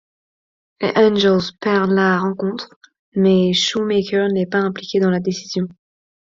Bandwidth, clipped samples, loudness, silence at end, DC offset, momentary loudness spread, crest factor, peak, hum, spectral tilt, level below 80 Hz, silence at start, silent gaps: 7.6 kHz; under 0.1%; -18 LUFS; 0.6 s; under 0.1%; 10 LU; 16 dB; -2 dBFS; none; -5.5 dB/octave; -58 dBFS; 0.8 s; 2.76-2.81 s, 2.99-3.12 s